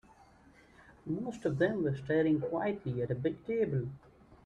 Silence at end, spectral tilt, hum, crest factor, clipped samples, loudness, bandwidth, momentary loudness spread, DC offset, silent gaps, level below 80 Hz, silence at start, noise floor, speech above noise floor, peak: 0.1 s; -8.5 dB/octave; none; 18 dB; under 0.1%; -34 LUFS; 9.4 kHz; 9 LU; under 0.1%; none; -64 dBFS; 0.9 s; -61 dBFS; 28 dB; -16 dBFS